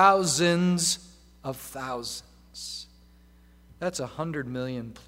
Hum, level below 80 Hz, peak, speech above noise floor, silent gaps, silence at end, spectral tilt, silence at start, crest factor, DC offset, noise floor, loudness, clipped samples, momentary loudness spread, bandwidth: 60 Hz at -55 dBFS; -56 dBFS; -4 dBFS; 29 dB; none; 0.05 s; -4 dB/octave; 0 s; 24 dB; under 0.1%; -55 dBFS; -28 LUFS; under 0.1%; 17 LU; 16 kHz